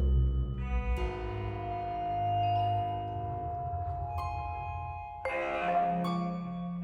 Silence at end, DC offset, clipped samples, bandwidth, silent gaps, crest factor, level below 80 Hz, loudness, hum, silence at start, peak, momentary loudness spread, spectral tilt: 0 s; under 0.1%; under 0.1%; 7 kHz; none; 14 dB; -38 dBFS; -34 LUFS; none; 0 s; -18 dBFS; 8 LU; -8.5 dB/octave